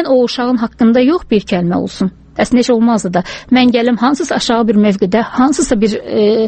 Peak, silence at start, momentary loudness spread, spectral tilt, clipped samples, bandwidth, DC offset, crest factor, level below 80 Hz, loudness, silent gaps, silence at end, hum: 0 dBFS; 0 s; 6 LU; -5.5 dB/octave; under 0.1%; 8.8 kHz; under 0.1%; 12 dB; -40 dBFS; -13 LUFS; none; 0 s; none